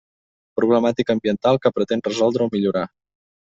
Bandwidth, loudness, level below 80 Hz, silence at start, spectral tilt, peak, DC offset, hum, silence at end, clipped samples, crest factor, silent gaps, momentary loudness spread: 7.8 kHz; -20 LUFS; -60 dBFS; 0.55 s; -6.5 dB/octave; -4 dBFS; under 0.1%; none; 0.65 s; under 0.1%; 18 dB; none; 6 LU